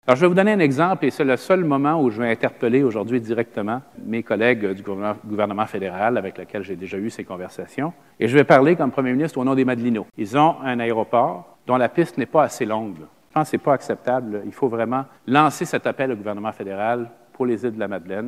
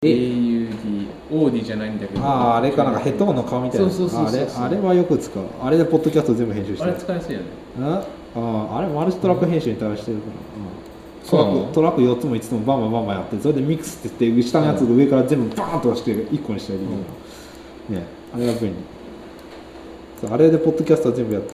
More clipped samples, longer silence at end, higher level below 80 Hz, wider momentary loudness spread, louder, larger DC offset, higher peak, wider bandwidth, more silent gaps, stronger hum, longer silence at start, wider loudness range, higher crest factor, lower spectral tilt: neither; about the same, 0 s vs 0 s; second, -66 dBFS vs -48 dBFS; second, 11 LU vs 17 LU; about the same, -21 LUFS vs -20 LUFS; neither; about the same, 0 dBFS vs -2 dBFS; about the same, 15 kHz vs 15 kHz; neither; neither; about the same, 0.05 s vs 0 s; about the same, 5 LU vs 6 LU; about the same, 20 dB vs 18 dB; about the same, -6.5 dB/octave vs -7.5 dB/octave